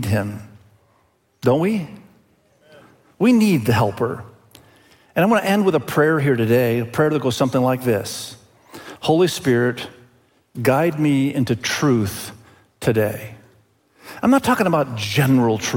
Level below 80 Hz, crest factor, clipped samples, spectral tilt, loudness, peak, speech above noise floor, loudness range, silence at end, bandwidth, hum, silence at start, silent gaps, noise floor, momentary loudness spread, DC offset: -56 dBFS; 16 dB; under 0.1%; -6 dB/octave; -19 LUFS; -4 dBFS; 43 dB; 3 LU; 0 s; 17 kHz; none; 0 s; none; -61 dBFS; 15 LU; under 0.1%